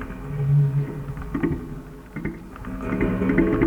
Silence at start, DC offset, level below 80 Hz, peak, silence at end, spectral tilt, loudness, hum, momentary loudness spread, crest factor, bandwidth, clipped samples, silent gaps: 0 s; under 0.1%; -36 dBFS; -6 dBFS; 0 s; -9.5 dB/octave; -25 LUFS; none; 16 LU; 18 dB; 4 kHz; under 0.1%; none